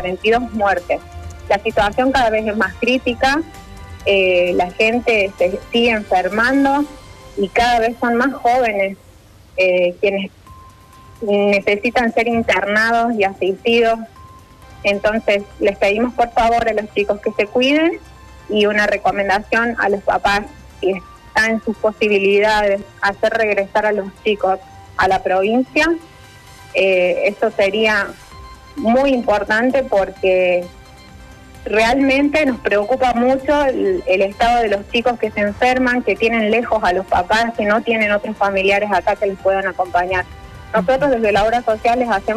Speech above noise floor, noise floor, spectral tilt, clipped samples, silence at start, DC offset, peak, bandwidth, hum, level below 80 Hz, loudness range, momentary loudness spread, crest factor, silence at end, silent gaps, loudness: 28 dB; -44 dBFS; -5 dB/octave; under 0.1%; 0 s; under 0.1%; -6 dBFS; 14 kHz; none; -42 dBFS; 2 LU; 7 LU; 12 dB; 0 s; none; -16 LUFS